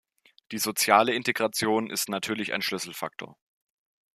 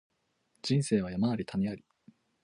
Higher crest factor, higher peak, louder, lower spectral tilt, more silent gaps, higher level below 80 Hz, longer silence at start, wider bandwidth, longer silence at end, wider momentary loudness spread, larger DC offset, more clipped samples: first, 26 dB vs 18 dB; first, -4 dBFS vs -16 dBFS; first, -26 LUFS vs -31 LUFS; second, -2.5 dB/octave vs -6.5 dB/octave; neither; second, -72 dBFS vs -62 dBFS; second, 0.5 s vs 0.65 s; first, 15 kHz vs 11 kHz; first, 0.8 s vs 0.65 s; first, 16 LU vs 10 LU; neither; neither